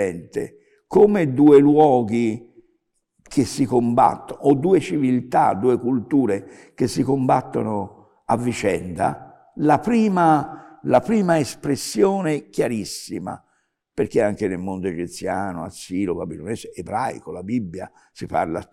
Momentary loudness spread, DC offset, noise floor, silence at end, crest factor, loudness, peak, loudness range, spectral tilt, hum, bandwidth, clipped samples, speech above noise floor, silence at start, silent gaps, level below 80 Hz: 15 LU; under 0.1%; -69 dBFS; 0.1 s; 16 dB; -20 LUFS; -4 dBFS; 8 LU; -6.5 dB/octave; none; 14 kHz; under 0.1%; 49 dB; 0 s; none; -56 dBFS